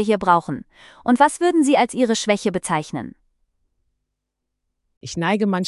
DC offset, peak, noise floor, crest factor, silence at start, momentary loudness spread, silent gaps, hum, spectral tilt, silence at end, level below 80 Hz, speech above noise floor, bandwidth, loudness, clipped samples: under 0.1%; -2 dBFS; -79 dBFS; 20 dB; 0 s; 15 LU; 4.97-5.01 s; none; -5 dB/octave; 0 s; -58 dBFS; 60 dB; 12 kHz; -19 LUFS; under 0.1%